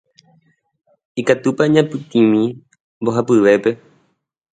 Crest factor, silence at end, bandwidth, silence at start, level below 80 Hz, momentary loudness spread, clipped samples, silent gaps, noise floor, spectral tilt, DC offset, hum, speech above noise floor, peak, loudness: 18 dB; 0.8 s; 9.2 kHz; 1.15 s; -62 dBFS; 10 LU; under 0.1%; 2.80-3.01 s; -61 dBFS; -6.5 dB/octave; under 0.1%; none; 46 dB; 0 dBFS; -16 LUFS